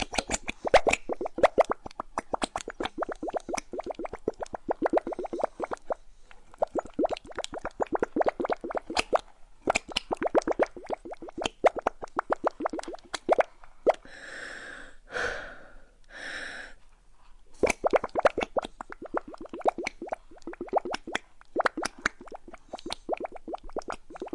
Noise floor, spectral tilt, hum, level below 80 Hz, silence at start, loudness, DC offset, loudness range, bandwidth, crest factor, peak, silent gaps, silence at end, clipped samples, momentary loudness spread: -52 dBFS; -3 dB/octave; none; -52 dBFS; 0 s; -31 LUFS; under 0.1%; 5 LU; 11.5 kHz; 20 dB; -10 dBFS; none; 0.05 s; under 0.1%; 14 LU